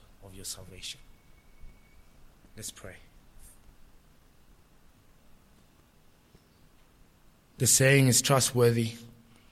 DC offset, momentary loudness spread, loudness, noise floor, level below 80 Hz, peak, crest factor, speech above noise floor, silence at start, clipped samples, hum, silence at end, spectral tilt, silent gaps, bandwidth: under 0.1%; 26 LU; -24 LUFS; -60 dBFS; -56 dBFS; -8 dBFS; 24 dB; 34 dB; 0.25 s; under 0.1%; none; 0.45 s; -3.5 dB/octave; none; 16 kHz